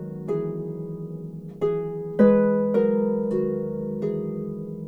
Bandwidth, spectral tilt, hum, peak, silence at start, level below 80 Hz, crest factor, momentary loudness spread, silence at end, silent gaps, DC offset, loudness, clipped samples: 4.2 kHz; -10.5 dB/octave; none; -6 dBFS; 0 s; -56 dBFS; 18 dB; 15 LU; 0 s; none; under 0.1%; -24 LUFS; under 0.1%